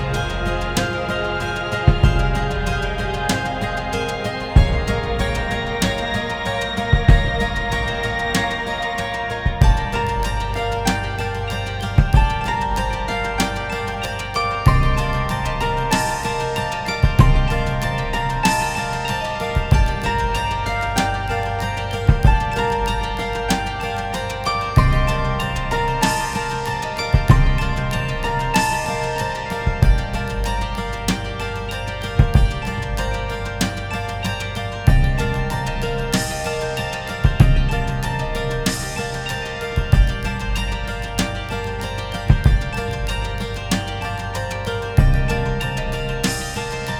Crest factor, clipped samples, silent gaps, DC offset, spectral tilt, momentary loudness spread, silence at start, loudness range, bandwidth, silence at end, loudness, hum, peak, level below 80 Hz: 20 dB; under 0.1%; none; under 0.1%; -5 dB/octave; 8 LU; 0 s; 3 LU; 17.5 kHz; 0 s; -21 LUFS; none; 0 dBFS; -24 dBFS